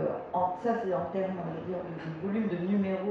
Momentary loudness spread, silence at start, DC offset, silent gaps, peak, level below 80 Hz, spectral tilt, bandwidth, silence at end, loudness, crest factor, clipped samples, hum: 7 LU; 0 s; under 0.1%; none; -16 dBFS; -66 dBFS; -9 dB/octave; 6.6 kHz; 0 s; -32 LUFS; 14 dB; under 0.1%; none